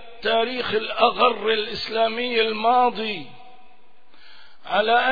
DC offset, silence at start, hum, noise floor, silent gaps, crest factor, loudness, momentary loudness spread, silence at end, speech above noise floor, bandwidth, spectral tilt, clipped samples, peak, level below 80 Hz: 1%; 0 s; none; -57 dBFS; none; 20 dB; -21 LUFS; 7 LU; 0 s; 36 dB; 5 kHz; -5 dB/octave; under 0.1%; -2 dBFS; -60 dBFS